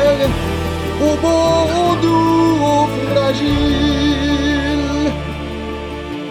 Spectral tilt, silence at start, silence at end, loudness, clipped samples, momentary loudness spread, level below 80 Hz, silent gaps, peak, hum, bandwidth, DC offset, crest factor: -6 dB/octave; 0 s; 0 s; -16 LUFS; under 0.1%; 11 LU; -28 dBFS; none; -2 dBFS; none; 16 kHz; under 0.1%; 12 dB